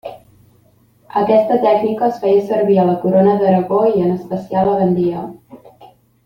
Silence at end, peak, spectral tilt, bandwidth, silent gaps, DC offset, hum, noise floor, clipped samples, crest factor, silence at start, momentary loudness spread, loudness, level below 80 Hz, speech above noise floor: 0.4 s; -2 dBFS; -9.5 dB/octave; 15.5 kHz; none; under 0.1%; none; -53 dBFS; under 0.1%; 14 dB; 0.05 s; 9 LU; -15 LUFS; -54 dBFS; 39 dB